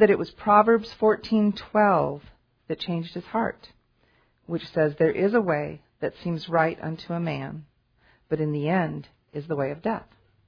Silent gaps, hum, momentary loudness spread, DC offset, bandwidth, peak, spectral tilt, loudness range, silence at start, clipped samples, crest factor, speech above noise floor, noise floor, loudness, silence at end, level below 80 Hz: none; none; 14 LU; under 0.1%; 5.4 kHz; -4 dBFS; -8.5 dB/octave; 6 LU; 0 s; under 0.1%; 22 dB; 40 dB; -65 dBFS; -25 LUFS; 0.45 s; -58 dBFS